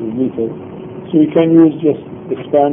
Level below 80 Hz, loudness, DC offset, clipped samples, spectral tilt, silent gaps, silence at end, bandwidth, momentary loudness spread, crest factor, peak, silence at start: -54 dBFS; -14 LUFS; under 0.1%; under 0.1%; -11.5 dB/octave; none; 0 s; 3.6 kHz; 18 LU; 14 dB; 0 dBFS; 0 s